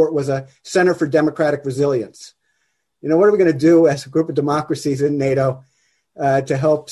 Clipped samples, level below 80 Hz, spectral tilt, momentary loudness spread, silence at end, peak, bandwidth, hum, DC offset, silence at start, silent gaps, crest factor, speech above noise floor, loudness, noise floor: under 0.1%; -56 dBFS; -7 dB/octave; 10 LU; 0 s; -4 dBFS; 12 kHz; none; under 0.1%; 0 s; none; 14 dB; 53 dB; -17 LUFS; -70 dBFS